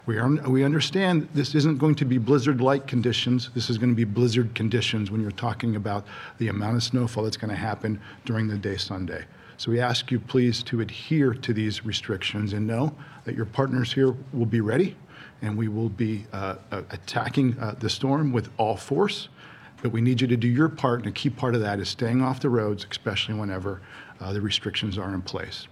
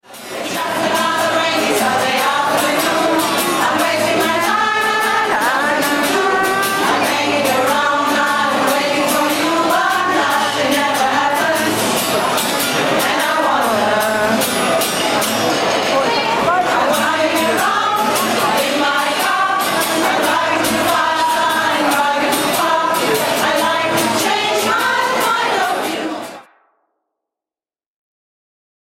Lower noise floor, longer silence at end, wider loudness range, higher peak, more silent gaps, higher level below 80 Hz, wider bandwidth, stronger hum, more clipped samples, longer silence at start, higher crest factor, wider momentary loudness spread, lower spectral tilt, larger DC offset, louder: second, -47 dBFS vs under -90 dBFS; second, 0.05 s vs 2.55 s; first, 5 LU vs 1 LU; about the same, -6 dBFS vs -4 dBFS; neither; second, -60 dBFS vs -54 dBFS; second, 12 kHz vs 16.5 kHz; neither; neither; about the same, 0.05 s vs 0.1 s; first, 20 dB vs 12 dB; first, 10 LU vs 1 LU; first, -6 dB/octave vs -2.5 dB/octave; neither; second, -25 LUFS vs -15 LUFS